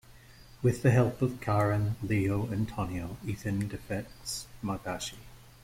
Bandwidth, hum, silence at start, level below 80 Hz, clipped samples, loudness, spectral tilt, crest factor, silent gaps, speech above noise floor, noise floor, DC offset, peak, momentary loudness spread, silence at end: 16.5 kHz; none; 0.1 s; -52 dBFS; under 0.1%; -31 LUFS; -6.5 dB/octave; 18 dB; none; 23 dB; -53 dBFS; under 0.1%; -12 dBFS; 12 LU; 0.15 s